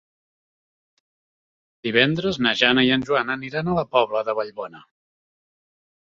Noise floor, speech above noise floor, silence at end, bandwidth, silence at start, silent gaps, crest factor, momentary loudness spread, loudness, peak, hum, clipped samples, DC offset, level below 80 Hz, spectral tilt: under -90 dBFS; over 69 dB; 1.35 s; 7.6 kHz; 1.85 s; none; 22 dB; 14 LU; -20 LUFS; -2 dBFS; none; under 0.1%; under 0.1%; -58 dBFS; -5.5 dB/octave